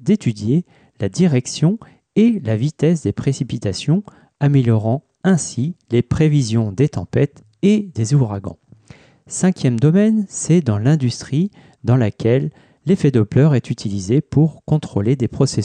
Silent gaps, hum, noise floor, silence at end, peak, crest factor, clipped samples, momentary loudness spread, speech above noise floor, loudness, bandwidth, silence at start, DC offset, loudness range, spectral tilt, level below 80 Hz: none; none; -46 dBFS; 0 s; -4 dBFS; 14 dB; under 0.1%; 7 LU; 29 dB; -18 LUFS; 9.8 kHz; 0 s; under 0.1%; 2 LU; -7 dB/octave; -48 dBFS